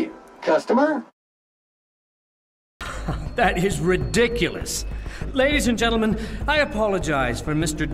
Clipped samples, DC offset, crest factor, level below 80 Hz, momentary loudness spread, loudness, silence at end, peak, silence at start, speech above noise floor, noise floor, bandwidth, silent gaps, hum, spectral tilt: under 0.1%; under 0.1%; 16 dB; -34 dBFS; 10 LU; -22 LUFS; 0 s; -6 dBFS; 0 s; over 69 dB; under -90 dBFS; 16 kHz; 1.13-2.80 s; none; -4.5 dB/octave